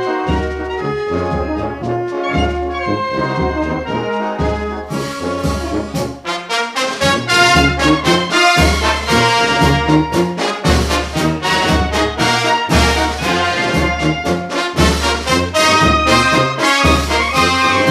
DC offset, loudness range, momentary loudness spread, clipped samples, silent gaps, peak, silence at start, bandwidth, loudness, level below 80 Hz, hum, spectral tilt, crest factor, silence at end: under 0.1%; 7 LU; 9 LU; under 0.1%; none; 0 dBFS; 0 s; 15.5 kHz; -14 LUFS; -26 dBFS; none; -4.5 dB/octave; 14 dB; 0 s